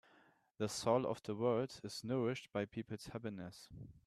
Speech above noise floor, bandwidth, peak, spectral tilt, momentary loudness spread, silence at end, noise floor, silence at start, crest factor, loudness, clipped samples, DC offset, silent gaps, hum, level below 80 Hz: 30 dB; 14 kHz; -20 dBFS; -5.5 dB/octave; 14 LU; 0.1 s; -71 dBFS; 0.6 s; 20 dB; -40 LUFS; under 0.1%; under 0.1%; none; none; -72 dBFS